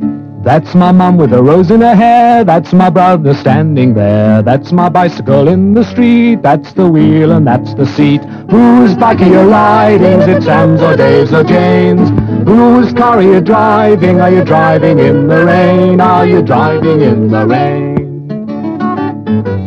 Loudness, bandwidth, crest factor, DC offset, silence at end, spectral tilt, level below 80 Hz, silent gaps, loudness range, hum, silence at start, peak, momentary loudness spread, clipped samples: -7 LUFS; 7 kHz; 6 dB; under 0.1%; 0 s; -9 dB/octave; -40 dBFS; none; 2 LU; none; 0 s; 0 dBFS; 8 LU; 6%